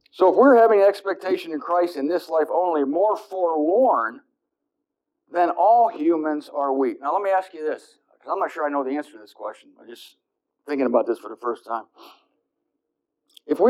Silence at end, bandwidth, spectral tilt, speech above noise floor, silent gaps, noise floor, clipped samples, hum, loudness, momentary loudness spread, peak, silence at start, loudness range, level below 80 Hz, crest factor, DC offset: 0 s; 13 kHz; -5.5 dB/octave; 60 dB; none; -81 dBFS; under 0.1%; none; -21 LUFS; 14 LU; -4 dBFS; 0.15 s; 8 LU; -84 dBFS; 18 dB; under 0.1%